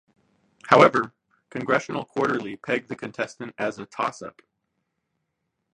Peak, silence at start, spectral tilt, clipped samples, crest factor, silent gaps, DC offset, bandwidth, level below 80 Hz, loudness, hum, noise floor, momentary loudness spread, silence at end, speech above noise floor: 0 dBFS; 0.65 s; -5.5 dB/octave; under 0.1%; 26 dB; none; under 0.1%; 10.5 kHz; -68 dBFS; -24 LUFS; none; -78 dBFS; 19 LU; 1.45 s; 55 dB